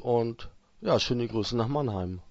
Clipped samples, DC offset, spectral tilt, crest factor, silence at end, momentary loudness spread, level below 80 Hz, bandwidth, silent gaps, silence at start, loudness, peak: under 0.1%; under 0.1%; -6 dB/octave; 18 dB; 0 s; 9 LU; -52 dBFS; 8 kHz; none; 0 s; -29 LUFS; -10 dBFS